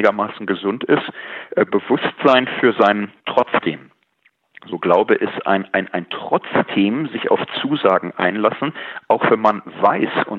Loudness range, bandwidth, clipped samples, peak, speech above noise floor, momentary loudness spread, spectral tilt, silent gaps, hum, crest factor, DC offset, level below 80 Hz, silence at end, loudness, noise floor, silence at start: 3 LU; 7 kHz; under 0.1%; 0 dBFS; 44 dB; 10 LU; -7.5 dB/octave; none; none; 18 dB; under 0.1%; -70 dBFS; 0 s; -18 LUFS; -62 dBFS; 0 s